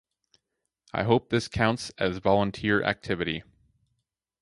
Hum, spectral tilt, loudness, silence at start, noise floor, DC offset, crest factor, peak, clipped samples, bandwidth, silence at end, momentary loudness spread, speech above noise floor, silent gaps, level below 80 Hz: none; -6 dB/octave; -27 LUFS; 0.95 s; -82 dBFS; under 0.1%; 22 dB; -6 dBFS; under 0.1%; 11.5 kHz; 1 s; 7 LU; 56 dB; none; -52 dBFS